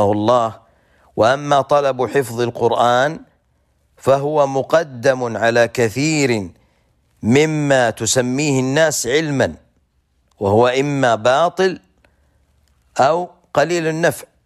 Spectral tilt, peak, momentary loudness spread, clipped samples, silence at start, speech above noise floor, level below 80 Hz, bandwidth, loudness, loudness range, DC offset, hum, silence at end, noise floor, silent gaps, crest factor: -4.5 dB/octave; -4 dBFS; 7 LU; under 0.1%; 0 s; 46 dB; -56 dBFS; 14.5 kHz; -17 LUFS; 2 LU; under 0.1%; none; 0.2 s; -62 dBFS; none; 14 dB